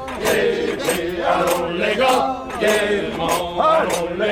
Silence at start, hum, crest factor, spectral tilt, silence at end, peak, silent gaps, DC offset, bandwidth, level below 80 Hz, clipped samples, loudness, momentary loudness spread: 0 s; none; 14 dB; -3.5 dB/octave; 0 s; -4 dBFS; none; under 0.1%; 19 kHz; -44 dBFS; under 0.1%; -19 LUFS; 5 LU